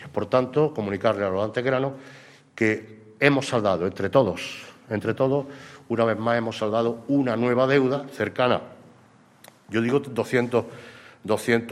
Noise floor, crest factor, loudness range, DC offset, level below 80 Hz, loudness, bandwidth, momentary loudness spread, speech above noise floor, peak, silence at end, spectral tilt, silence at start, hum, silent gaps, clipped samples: -55 dBFS; 22 dB; 3 LU; under 0.1%; -64 dBFS; -24 LUFS; 14 kHz; 11 LU; 31 dB; -2 dBFS; 0 s; -6.5 dB/octave; 0 s; none; none; under 0.1%